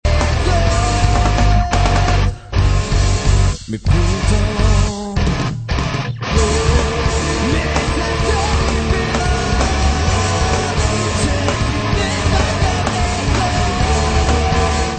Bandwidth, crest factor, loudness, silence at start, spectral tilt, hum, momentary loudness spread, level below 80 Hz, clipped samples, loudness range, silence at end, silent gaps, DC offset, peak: 9.2 kHz; 14 dB; -16 LUFS; 0.05 s; -5 dB/octave; none; 4 LU; -18 dBFS; under 0.1%; 2 LU; 0 s; none; 0.1%; 0 dBFS